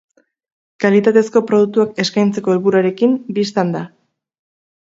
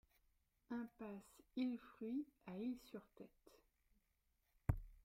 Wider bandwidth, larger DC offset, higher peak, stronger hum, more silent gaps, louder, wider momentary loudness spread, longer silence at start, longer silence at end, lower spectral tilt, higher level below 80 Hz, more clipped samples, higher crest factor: second, 7.8 kHz vs 16 kHz; neither; first, 0 dBFS vs -24 dBFS; neither; neither; first, -15 LUFS vs -49 LUFS; second, 6 LU vs 13 LU; about the same, 0.8 s vs 0.7 s; first, 1 s vs 0.05 s; second, -6 dB/octave vs -8 dB/octave; about the same, -64 dBFS vs -60 dBFS; neither; second, 16 dB vs 28 dB